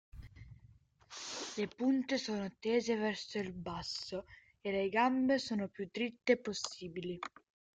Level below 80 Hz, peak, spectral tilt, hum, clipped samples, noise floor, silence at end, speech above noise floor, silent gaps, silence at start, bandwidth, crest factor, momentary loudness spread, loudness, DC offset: -66 dBFS; -16 dBFS; -4.5 dB/octave; none; under 0.1%; -64 dBFS; 0.5 s; 28 dB; none; 0.15 s; 9.2 kHz; 22 dB; 14 LU; -37 LUFS; under 0.1%